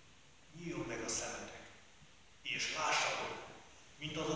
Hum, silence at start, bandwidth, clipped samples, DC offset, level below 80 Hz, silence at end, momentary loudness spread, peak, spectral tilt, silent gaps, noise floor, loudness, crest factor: none; 0.05 s; 8 kHz; under 0.1%; under 0.1%; -68 dBFS; 0 s; 23 LU; -22 dBFS; -2 dB/octave; none; -64 dBFS; -39 LUFS; 20 dB